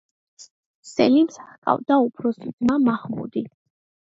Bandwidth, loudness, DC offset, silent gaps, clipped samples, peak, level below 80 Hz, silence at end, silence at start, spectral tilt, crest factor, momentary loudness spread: 8 kHz; -22 LUFS; under 0.1%; 0.51-0.83 s, 1.58-1.62 s, 2.53-2.58 s; under 0.1%; -4 dBFS; -62 dBFS; 0.65 s; 0.4 s; -6 dB/octave; 20 dB; 12 LU